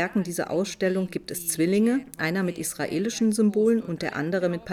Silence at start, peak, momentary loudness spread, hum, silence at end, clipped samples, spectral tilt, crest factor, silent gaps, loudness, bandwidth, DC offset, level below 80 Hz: 0 s; -12 dBFS; 7 LU; none; 0 s; under 0.1%; -5 dB/octave; 14 dB; none; -25 LUFS; 17.5 kHz; under 0.1%; -62 dBFS